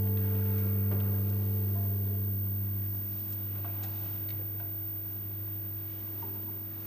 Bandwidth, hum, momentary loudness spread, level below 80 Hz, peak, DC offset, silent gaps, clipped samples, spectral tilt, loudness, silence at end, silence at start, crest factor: 15 kHz; none; 6 LU; -62 dBFS; -20 dBFS; under 0.1%; none; under 0.1%; -8.5 dB/octave; -32 LUFS; 0 s; 0 s; 12 dB